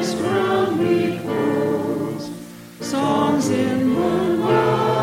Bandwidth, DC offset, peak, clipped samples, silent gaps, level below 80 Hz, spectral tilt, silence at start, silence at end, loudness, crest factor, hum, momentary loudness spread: 16.5 kHz; under 0.1%; -6 dBFS; under 0.1%; none; -54 dBFS; -6 dB/octave; 0 s; 0 s; -20 LUFS; 14 dB; none; 11 LU